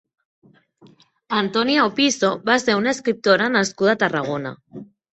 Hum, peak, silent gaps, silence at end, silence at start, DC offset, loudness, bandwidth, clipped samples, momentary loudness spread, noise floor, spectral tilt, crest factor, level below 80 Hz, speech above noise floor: none; -2 dBFS; none; 0.3 s; 1.3 s; under 0.1%; -19 LUFS; 8.4 kHz; under 0.1%; 13 LU; -52 dBFS; -3.5 dB/octave; 18 dB; -64 dBFS; 33 dB